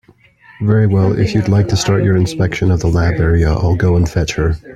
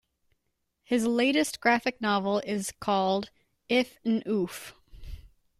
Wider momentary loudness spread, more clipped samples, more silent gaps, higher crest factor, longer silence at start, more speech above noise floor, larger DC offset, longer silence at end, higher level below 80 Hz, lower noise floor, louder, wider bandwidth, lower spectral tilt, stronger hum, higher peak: second, 3 LU vs 19 LU; neither; neither; about the same, 14 dB vs 18 dB; second, 0.6 s vs 0.9 s; second, 33 dB vs 51 dB; neither; second, 0 s vs 0.35 s; first, -28 dBFS vs -54 dBFS; second, -46 dBFS vs -78 dBFS; first, -14 LUFS vs -27 LUFS; second, 9.2 kHz vs 15.5 kHz; first, -6.5 dB/octave vs -4 dB/octave; neither; first, 0 dBFS vs -12 dBFS